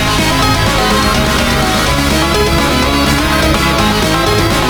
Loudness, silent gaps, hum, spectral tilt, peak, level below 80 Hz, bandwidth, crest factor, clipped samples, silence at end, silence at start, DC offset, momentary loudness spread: -11 LUFS; none; none; -4 dB/octave; 0 dBFS; -20 dBFS; over 20 kHz; 10 dB; under 0.1%; 0 s; 0 s; under 0.1%; 1 LU